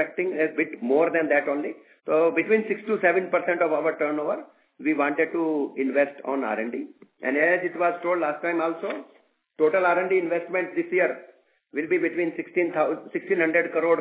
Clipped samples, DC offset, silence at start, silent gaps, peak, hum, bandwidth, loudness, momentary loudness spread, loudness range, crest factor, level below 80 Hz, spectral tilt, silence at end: under 0.1%; under 0.1%; 0 s; none; -6 dBFS; none; 4 kHz; -24 LUFS; 10 LU; 3 LU; 18 dB; -88 dBFS; -9.5 dB/octave; 0 s